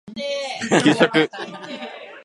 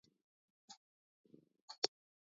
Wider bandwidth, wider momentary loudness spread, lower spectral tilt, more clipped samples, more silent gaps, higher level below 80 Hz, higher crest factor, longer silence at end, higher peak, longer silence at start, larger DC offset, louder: first, 11.5 kHz vs 7.4 kHz; second, 17 LU vs 21 LU; first, -4.5 dB/octave vs 1 dB/octave; neither; second, none vs 0.77-1.24 s, 1.62-1.68 s, 1.78-1.82 s; first, -66 dBFS vs under -90 dBFS; second, 20 dB vs 36 dB; second, 0.05 s vs 0.45 s; first, 0 dBFS vs -16 dBFS; second, 0.05 s vs 0.7 s; neither; first, -19 LUFS vs -42 LUFS